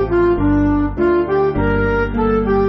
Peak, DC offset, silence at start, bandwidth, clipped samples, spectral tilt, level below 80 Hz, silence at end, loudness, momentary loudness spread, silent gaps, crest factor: -4 dBFS; under 0.1%; 0 s; 6 kHz; under 0.1%; -7.5 dB/octave; -26 dBFS; 0 s; -16 LUFS; 2 LU; none; 10 dB